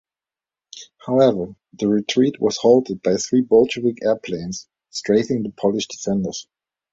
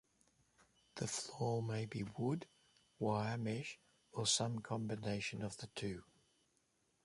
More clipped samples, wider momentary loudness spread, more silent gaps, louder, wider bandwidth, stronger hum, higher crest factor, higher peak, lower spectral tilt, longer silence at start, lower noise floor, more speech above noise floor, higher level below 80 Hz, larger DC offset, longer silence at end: neither; about the same, 16 LU vs 14 LU; neither; first, -19 LUFS vs -41 LUFS; second, 7.8 kHz vs 11.5 kHz; neither; about the same, 18 dB vs 20 dB; first, -2 dBFS vs -22 dBFS; about the same, -5 dB/octave vs -4 dB/octave; second, 0.75 s vs 0.95 s; first, under -90 dBFS vs -80 dBFS; first, over 71 dB vs 39 dB; first, -58 dBFS vs -72 dBFS; neither; second, 0.5 s vs 1 s